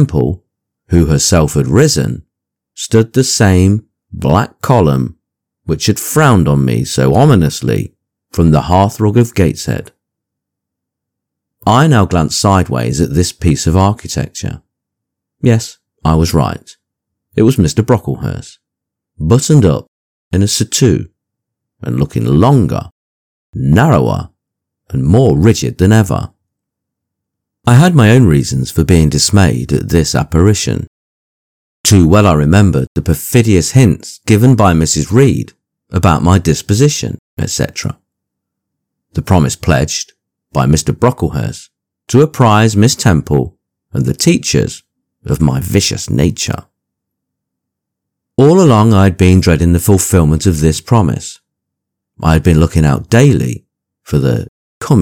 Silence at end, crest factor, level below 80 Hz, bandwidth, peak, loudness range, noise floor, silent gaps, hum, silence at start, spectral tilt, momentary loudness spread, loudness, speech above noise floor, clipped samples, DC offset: 0 s; 12 dB; -30 dBFS; 18.5 kHz; 0 dBFS; 5 LU; -80 dBFS; 19.88-20.31 s, 22.92-23.53 s, 30.87-31.84 s, 32.87-32.95 s, 37.19-37.37 s, 54.48-54.81 s; none; 0 s; -6 dB/octave; 13 LU; -11 LUFS; 70 dB; 1%; under 0.1%